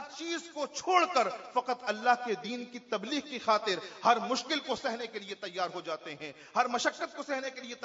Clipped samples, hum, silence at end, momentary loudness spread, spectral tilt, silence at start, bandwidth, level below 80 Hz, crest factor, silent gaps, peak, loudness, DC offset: under 0.1%; none; 0 s; 11 LU; -0.5 dB/octave; 0 s; 7.6 kHz; -78 dBFS; 22 dB; none; -12 dBFS; -32 LUFS; under 0.1%